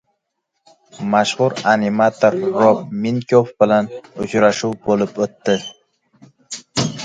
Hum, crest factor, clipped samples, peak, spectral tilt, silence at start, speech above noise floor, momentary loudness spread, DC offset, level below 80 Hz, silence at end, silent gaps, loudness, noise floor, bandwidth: none; 18 dB; under 0.1%; 0 dBFS; -5 dB/octave; 0.95 s; 58 dB; 11 LU; under 0.1%; -56 dBFS; 0 s; none; -17 LUFS; -74 dBFS; 9.4 kHz